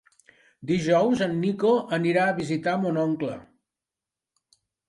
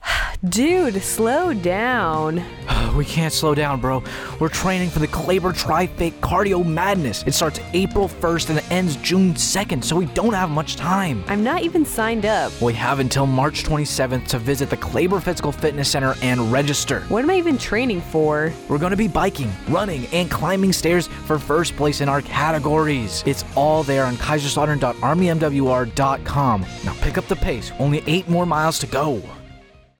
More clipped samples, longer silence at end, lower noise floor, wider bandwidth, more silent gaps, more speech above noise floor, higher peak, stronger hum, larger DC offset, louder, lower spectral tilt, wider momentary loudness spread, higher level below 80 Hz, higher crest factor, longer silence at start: neither; first, 1.45 s vs 0.4 s; first, -89 dBFS vs -46 dBFS; second, 11.5 kHz vs 19 kHz; neither; first, 66 dB vs 26 dB; second, -10 dBFS vs -6 dBFS; neither; neither; second, -24 LUFS vs -20 LUFS; first, -6.5 dB/octave vs -5 dB/octave; first, 9 LU vs 5 LU; second, -64 dBFS vs -34 dBFS; about the same, 16 dB vs 14 dB; first, 0.6 s vs 0 s